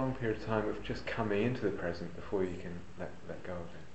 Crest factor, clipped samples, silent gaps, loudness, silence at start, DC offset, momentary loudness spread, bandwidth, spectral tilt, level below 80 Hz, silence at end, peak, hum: 20 dB; under 0.1%; none; -37 LUFS; 0 s; 0.6%; 12 LU; 8.2 kHz; -7.5 dB/octave; -56 dBFS; 0 s; -16 dBFS; none